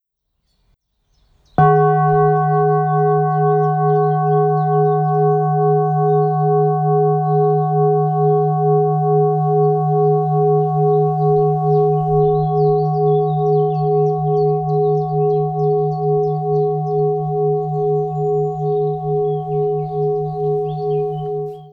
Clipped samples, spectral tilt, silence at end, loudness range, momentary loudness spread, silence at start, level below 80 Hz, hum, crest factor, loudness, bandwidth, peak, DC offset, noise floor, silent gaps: under 0.1%; -11.5 dB/octave; 0.05 s; 4 LU; 4 LU; 1.6 s; -48 dBFS; none; 14 dB; -16 LUFS; 3.5 kHz; -2 dBFS; under 0.1%; -71 dBFS; none